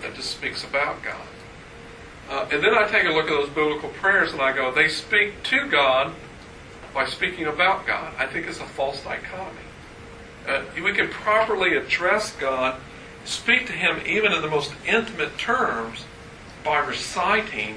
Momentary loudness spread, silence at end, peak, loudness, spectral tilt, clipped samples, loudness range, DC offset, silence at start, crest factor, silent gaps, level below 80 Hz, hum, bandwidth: 22 LU; 0 s; -2 dBFS; -22 LUFS; -3 dB/octave; under 0.1%; 5 LU; under 0.1%; 0 s; 22 dB; none; -50 dBFS; none; 11 kHz